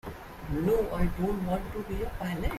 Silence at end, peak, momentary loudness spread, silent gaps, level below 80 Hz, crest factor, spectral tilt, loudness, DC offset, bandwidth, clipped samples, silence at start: 0 s; -14 dBFS; 9 LU; none; -38 dBFS; 16 dB; -7.5 dB/octave; -31 LUFS; under 0.1%; 16 kHz; under 0.1%; 0.05 s